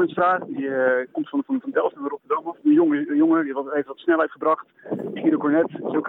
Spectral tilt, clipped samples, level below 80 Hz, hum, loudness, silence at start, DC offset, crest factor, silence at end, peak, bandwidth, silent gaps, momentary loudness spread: -9.5 dB/octave; under 0.1%; -74 dBFS; none; -22 LUFS; 0 s; under 0.1%; 14 dB; 0 s; -8 dBFS; 4 kHz; none; 8 LU